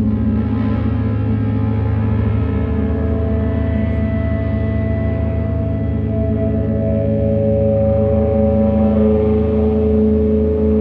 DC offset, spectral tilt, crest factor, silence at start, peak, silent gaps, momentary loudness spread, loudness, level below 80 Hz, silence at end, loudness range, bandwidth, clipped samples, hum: under 0.1%; -12 dB/octave; 12 dB; 0 s; -2 dBFS; none; 4 LU; -17 LUFS; -24 dBFS; 0 s; 4 LU; 4.2 kHz; under 0.1%; none